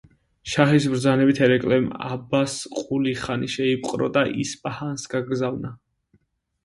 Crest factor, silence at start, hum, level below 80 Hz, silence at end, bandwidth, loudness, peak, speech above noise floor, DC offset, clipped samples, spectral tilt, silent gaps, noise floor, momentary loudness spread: 22 dB; 0.45 s; none; -56 dBFS; 0.9 s; 11.5 kHz; -23 LUFS; 0 dBFS; 43 dB; under 0.1%; under 0.1%; -5.5 dB/octave; none; -65 dBFS; 12 LU